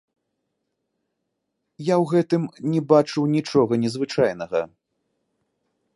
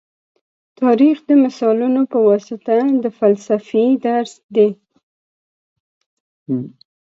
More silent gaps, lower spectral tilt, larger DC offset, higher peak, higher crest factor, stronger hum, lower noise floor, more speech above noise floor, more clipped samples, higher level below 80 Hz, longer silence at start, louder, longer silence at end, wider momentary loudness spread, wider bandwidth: second, none vs 4.44-4.49 s, 5.03-6.46 s; about the same, -7 dB/octave vs -7.5 dB/octave; neither; about the same, -2 dBFS vs -2 dBFS; first, 22 dB vs 16 dB; neither; second, -78 dBFS vs under -90 dBFS; second, 57 dB vs over 75 dB; neither; first, -64 dBFS vs -72 dBFS; first, 1.8 s vs 0.8 s; second, -22 LUFS vs -16 LUFS; first, 1.3 s vs 0.5 s; about the same, 9 LU vs 9 LU; first, 11.5 kHz vs 7.8 kHz